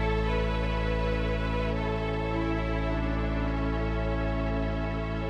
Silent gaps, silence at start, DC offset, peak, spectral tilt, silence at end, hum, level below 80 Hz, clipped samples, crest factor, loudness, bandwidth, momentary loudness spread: none; 0 s; 0.1%; -16 dBFS; -8 dB/octave; 0 s; none; -32 dBFS; under 0.1%; 12 dB; -30 LUFS; 6.8 kHz; 2 LU